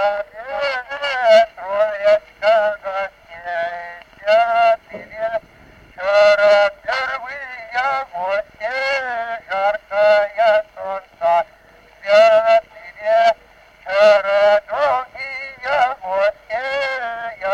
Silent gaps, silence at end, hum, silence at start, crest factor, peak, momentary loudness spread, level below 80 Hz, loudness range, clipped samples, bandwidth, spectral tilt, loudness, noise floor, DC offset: none; 0 s; none; 0 s; 14 dB; -4 dBFS; 15 LU; -56 dBFS; 4 LU; under 0.1%; 8.4 kHz; -2.5 dB/octave; -17 LUFS; -48 dBFS; under 0.1%